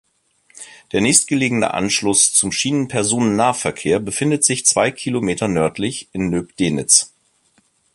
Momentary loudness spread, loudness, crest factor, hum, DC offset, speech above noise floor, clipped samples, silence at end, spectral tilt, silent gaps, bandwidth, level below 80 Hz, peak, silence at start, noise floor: 10 LU; -16 LUFS; 18 dB; none; under 0.1%; 43 dB; under 0.1%; 0.9 s; -3 dB/octave; none; 12.5 kHz; -50 dBFS; 0 dBFS; 0.55 s; -60 dBFS